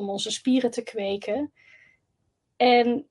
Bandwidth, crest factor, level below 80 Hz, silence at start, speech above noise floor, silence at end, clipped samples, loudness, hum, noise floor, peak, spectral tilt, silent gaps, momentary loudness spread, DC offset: 11.5 kHz; 18 dB; -74 dBFS; 0 s; 51 dB; 0.1 s; under 0.1%; -24 LUFS; none; -75 dBFS; -8 dBFS; -3.5 dB/octave; none; 11 LU; under 0.1%